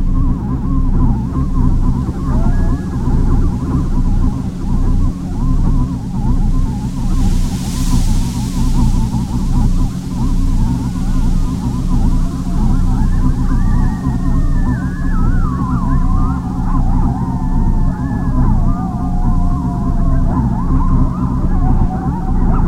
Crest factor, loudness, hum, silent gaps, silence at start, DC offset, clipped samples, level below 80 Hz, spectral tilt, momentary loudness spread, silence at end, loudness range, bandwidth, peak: 12 dB; -17 LUFS; none; none; 0 s; under 0.1%; under 0.1%; -14 dBFS; -8 dB/octave; 3 LU; 0 s; 1 LU; 11 kHz; 0 dBFS